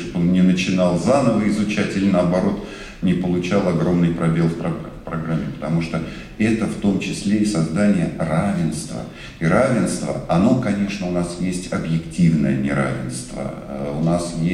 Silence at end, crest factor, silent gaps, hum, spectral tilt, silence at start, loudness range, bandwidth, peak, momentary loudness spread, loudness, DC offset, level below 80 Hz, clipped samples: 0 s; 16 dB; none; none; -6.5 dB/octave; 0 s; 3 LU; 12 kHz; -4 dBFS; 11 LU; -20 LUFS; under 0.1%; -42 dBFS; under 0.1%